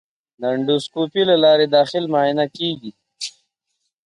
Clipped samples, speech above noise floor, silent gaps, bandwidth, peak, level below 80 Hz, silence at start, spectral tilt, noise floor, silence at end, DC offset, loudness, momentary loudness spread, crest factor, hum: under 0.1%; 57 dB; none; 11 kHz; -4 dBFS; -68 dBFS; 0.4 s; -5 dB/octave; -75 dBFS; 0.75 s; under 0.1%; -18 LUFS; 17 LU; 16 dB; none